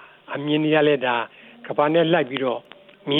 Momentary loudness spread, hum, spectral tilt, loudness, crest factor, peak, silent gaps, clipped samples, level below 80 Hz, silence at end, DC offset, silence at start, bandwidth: 16 LU; none; -9 dB/octave; -21 LUFS; 16 dB; -6 dBFS; none; under 0.1%; -76 dBFS; 0 s; under 0.1%; 0 s; 4.1 kHz